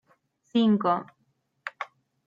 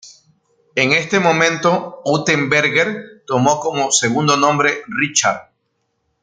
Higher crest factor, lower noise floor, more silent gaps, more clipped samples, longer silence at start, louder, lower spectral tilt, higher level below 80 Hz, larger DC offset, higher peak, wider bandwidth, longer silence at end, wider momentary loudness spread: about the same, 16 dB vs 16 dB; first, -73 dBFS vs -69 dBFS; neither; neither; first, 0.55 s vs 0.05 s; second, -26 LUFS vs -16 LUFS; first, -7.5 dB/octave vs -3.5 dB/octave; second, -74 dBFS vs -60 dBFS; neither; second, -12 dBFS vs 0 dBFS; second, 7.2 kHz vs 10 kHz; second, 0.4 s vs 0.8 s; first, 18 LU vs 7 LU